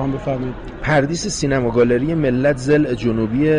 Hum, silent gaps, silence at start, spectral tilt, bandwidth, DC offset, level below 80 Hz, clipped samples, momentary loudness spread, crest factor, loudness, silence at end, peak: none; none; 0 s; -6 dB/octave; 11 kHz; under 0.1%; -36 dBFS; under 0.1%; 7 LU; 12 dB; -18 LUFS; 0 s; -6 dBFS